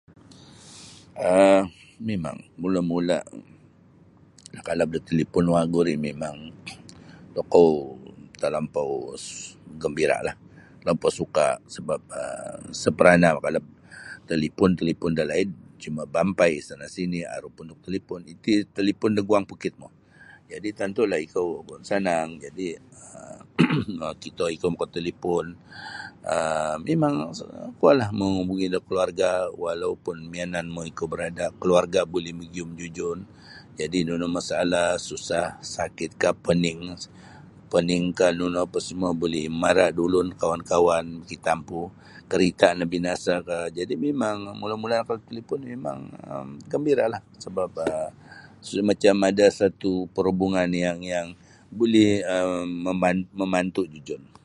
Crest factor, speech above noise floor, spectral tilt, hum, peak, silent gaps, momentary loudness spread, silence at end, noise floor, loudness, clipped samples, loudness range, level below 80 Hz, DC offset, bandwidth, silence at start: 24 dB; 30 dB; -5.5 dB/octave; none; 0 dBFS; none; 17 LU; 0.2 s; -54 dBFS; -25 LUFS; under 0.1%; 5 LU; -54 dBFS; under 0.1%; 11.5 kHz; 0.5 s